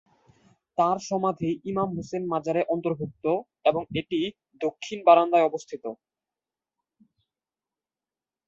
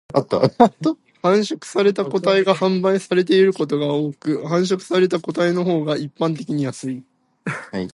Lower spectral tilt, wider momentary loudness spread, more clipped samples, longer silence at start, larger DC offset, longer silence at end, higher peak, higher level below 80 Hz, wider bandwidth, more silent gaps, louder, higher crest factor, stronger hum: about the same, -6 dB/octave vs -6 dB/octave; first, 14 LU vs 11 LU; neither; first, 0.8 s vs 0.15 s; neither; first, 2.55 s vs 0.05 s; second, -4 dBFS vs 0 dBFS; about the same, -66 dBFS vs -62 dBFS; second, 7.6 kHz vs 11.5 kHz; neither; second, -26 LUFS vs -19 LUFS; first, 24 dB vs 18 dB; neither